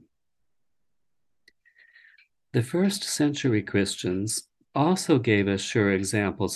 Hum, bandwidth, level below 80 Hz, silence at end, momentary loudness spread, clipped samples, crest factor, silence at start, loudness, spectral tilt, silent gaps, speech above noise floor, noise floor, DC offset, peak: none; 12.5 kHz; -54 dBFS; 0 s; 7 LU; under 0.1%; 20 dB; 2.55 s; -25 LUFS; -5 dB/octave; none; 60 dB; -85 dBFS; under 0.1%; -8 dBFS